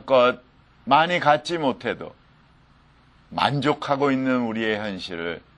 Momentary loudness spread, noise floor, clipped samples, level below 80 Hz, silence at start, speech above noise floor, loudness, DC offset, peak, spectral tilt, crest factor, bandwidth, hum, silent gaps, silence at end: 15 LU; -55 dBFS; under 0.1%; -60 dBFS; 0.05 s; 33 dB; -22 LUFS; under 0.1%; -2 dBFS; -5.5 dB/octave; 22 dB; 11 kHz; none; none; 0.2 s